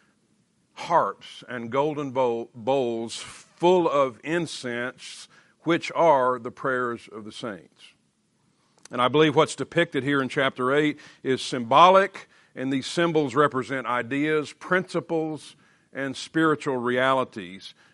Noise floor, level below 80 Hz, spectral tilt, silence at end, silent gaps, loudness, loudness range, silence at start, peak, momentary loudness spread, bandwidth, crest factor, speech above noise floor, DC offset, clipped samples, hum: -68 dBFS; -72 dBFS; -5 dB/octave; 0.2 s; none; -24 LUFS; 5 LU; 0.75 s; -2 dBFS; 17 LU; 11.5 kHz; 22 dB; 44 dB; under 0.1%; under 0.1%; none